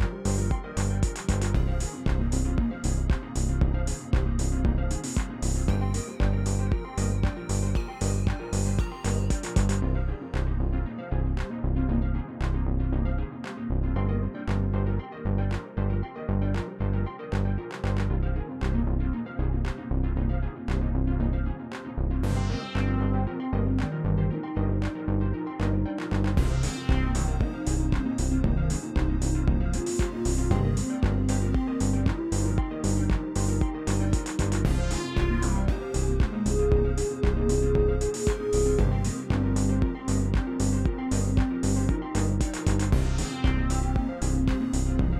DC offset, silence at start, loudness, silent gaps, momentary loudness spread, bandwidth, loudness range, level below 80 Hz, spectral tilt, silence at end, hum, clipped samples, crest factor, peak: under 0.1%; 0 s; -28 LUFS; none; 5 LU; 13 kHz; 3 LU; -28 dBFS; -6.5 dB/octave; 0 s; none; under 0.1%; 16 dB; -10 dBFS